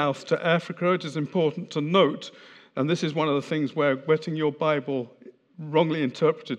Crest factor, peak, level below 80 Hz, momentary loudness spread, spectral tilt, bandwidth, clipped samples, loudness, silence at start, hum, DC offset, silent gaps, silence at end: 20 dB; -6 dBFS; -84 dBFS; 9 LU; -6.5 dB/octave; 9.6 kHz; under 0.1%; -25 LUFS; 0 s; none; under 0.1%; none; 0 s